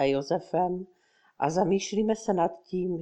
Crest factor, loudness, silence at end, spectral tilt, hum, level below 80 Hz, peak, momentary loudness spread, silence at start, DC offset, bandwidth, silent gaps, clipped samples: 18 dB; -28 LUFS; 0 s; -6 dB/octave; none; -60 dBFS; -10 dBFS; 6 LU; 0 s; under 0.1%; 9.2 kHz; none; under 0.1%